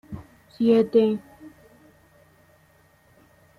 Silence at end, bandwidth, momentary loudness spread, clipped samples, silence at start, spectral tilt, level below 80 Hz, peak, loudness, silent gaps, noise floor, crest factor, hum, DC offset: 2.1 s; 11 kHz; 23 LU; under 0.1%; 0.1 s; -8 dB/octave; -62 dBFS; -8 dBFS; -21 LUFS; none; -59 dBFS; 18 dB; none; under 0.1%